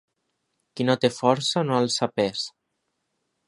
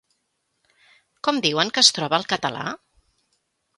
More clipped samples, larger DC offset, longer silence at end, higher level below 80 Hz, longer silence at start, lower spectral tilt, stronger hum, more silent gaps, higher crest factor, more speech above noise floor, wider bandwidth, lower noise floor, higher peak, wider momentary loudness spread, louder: neither; neither; about the same, 1 s vs 1 s; about the same, -68 dBFS vs -68 dBFS; second, 0.75 s vs 1.25 s; first, -4.5 dB/octave vs -2 dB/octave; neither; neither; about the same, 22 dB vs 26 dB; about the same, 54 dB vs 52 dB; about the same, 11.5 kHz vs 11.5 kHz; about the same, -77 dBFS vs -74 dBFS; second, -4 dBFS vs 0 dBFS; second, 10 LU vs 16 LU; second, -23 LUFS vs -20 LUFS